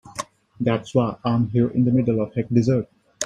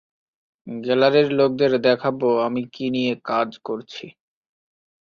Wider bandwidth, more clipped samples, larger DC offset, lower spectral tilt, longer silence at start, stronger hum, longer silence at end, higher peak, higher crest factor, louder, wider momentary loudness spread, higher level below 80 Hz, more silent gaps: first, 11.5 kHz vs 6.8 kHz; neither; neither; about the same, -7 dB/octave vs -7 dB/octave; second, 0.05 s vs 0.65 s; neither; second, 0 s vs 0.95 s; about the same, -4 dBFS vs -4 dBFS; about the same, 16 dB vs 18 dB; about the same, -21 LUFS vs -21 LUFS; about the same, 15 LU vs 14 LU; first, -54 dBFS vs -64 dBFS; neither